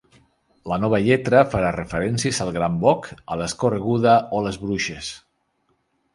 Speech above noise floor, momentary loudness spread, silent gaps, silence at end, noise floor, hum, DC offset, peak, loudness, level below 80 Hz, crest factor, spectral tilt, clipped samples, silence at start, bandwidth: 48 dB; 12 LU; none; 1 s; -68 dBFS; none; under 0.1%; 0 dBFS; -21 LUFS; -46 dBFS; 20 dB; -5.5 dB/octave; under 0.1%; 0.65 s; 11.5 kHz